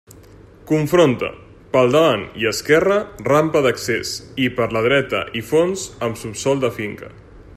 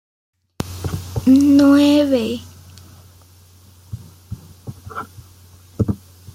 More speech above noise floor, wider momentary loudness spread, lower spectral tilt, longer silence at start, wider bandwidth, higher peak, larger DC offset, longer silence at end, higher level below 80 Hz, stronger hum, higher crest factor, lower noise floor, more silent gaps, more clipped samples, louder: second, 26 dB vs 35 dB; second, 10 LU vs 26 LU; second, -5 dB/octave vs -6.5 dB/octave; about the same, 0.65 s vs 0.6 s; about the same, 15 kHz vs 15.5 kHz; about the same, -2 dBFS vs -2 dBFS; neither; second, 0.05 s vs 0.4 s; about the same, -48 dBFS vs -46 dBFS; neither; about the same, 18 dB vs 18 dB; about the same, -44 dBFS vs -47 dBFS; neither; neither; second, -18 LUFS vs -15 LUFS